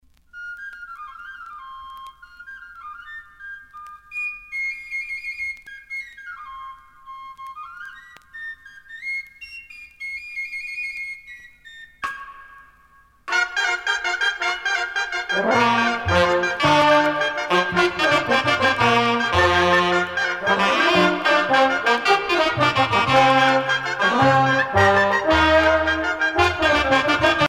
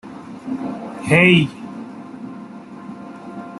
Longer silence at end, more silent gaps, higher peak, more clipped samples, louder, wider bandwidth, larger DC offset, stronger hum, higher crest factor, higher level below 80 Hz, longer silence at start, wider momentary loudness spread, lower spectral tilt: about the same, 0 s vs 0 s; neither; about the same, -4 dBFS vs -2 dBFS; neither; about the same, -19 LUFS vs -17 LUFS; first, 16 kHz vs 12 kHz; neither; neither; about the same, 18 dB vs 20 dB; first, -46 dBFS vs -56 dBFS; first, 0.35 s vs 0.05 s; about the same, 21 LU vs 23 LU; second, -4 dB/octave vs -6 dB/octave